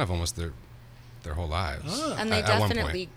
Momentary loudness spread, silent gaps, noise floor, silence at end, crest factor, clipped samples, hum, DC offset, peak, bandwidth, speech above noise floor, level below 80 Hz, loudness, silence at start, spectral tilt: 14 LU; none; -48 dBFS; 0 s; 20 dB; under 0.1%; none; under 0.1%; -10 dBFS; 15.5 kHz; 20 dB; -40 dBFS; -28 LUFS; 0 s; -4.5 dB/octave